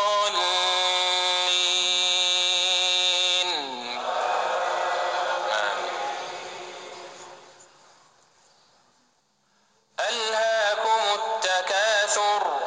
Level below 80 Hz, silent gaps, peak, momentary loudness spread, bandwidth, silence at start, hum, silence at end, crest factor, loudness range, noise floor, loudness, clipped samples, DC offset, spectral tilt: -80 dBFS; none; -8 dBFS; 15 LU; 10 kHz; 0 s; none; 0 s; 18 dB; 16 LU; -67 dBFS; -22 LUFS; under 0.1%; under 0.1%; 1.5 dB/octave